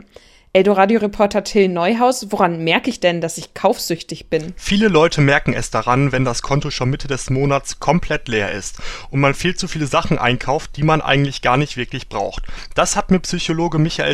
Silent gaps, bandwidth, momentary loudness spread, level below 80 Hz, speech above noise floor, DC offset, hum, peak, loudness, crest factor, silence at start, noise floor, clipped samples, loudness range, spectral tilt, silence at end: none; 15 kHz; 9 LU; -34 dBFS; 29 dB; under 0.1%; none; 0 dBFS; -17 LUFS; 18 dB; 0.55 s; -46 dBFS; under 0.1%; 3 LU; -5 dB/octave; 0 s